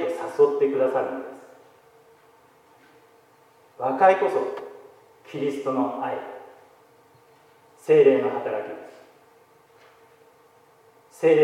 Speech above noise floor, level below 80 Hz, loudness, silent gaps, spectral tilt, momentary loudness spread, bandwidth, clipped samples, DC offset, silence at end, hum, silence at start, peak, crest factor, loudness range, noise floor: 35 dB; -82 dBFS; -23 LUFS; none; -6.5 dB/octave; 22 LU; 12 kHz; under 0.1%; under 0.1%; 0 s; none; 0 s; -6 dBFS; 20 dB; 7 LU; -56 dBFS